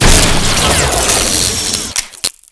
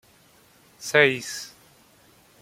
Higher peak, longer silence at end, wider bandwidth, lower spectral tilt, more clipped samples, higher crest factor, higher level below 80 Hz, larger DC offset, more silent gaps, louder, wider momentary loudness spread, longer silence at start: about the same, 0 dBFS vs -2 dBFS; second, 0.2 s vs 0.95 s; second, 11 kHz vs 16.5 kHz; about the same, -2 dB/octave vs -3 dB/octave; first, 0.3% vs under 0.1%; second, 12 dB vs 26 dB; first, -18 dBFS vs -70 dBFS; neither; neither; first, -11 LUFS vs -22 LUFS; second, 8 LU vs 19 LU; second, 0 s vs 0.8 s